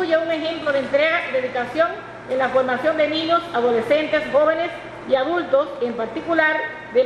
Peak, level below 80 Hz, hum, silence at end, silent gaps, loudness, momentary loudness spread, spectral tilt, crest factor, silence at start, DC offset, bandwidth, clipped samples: -2 dBFS; -58 dBFS; none; 0 s; none; -20 LUFS; 7 LU; -5 dB/octave; 18 dB; 0 s; under 0.1%; 10.5 kHz; under 0.1%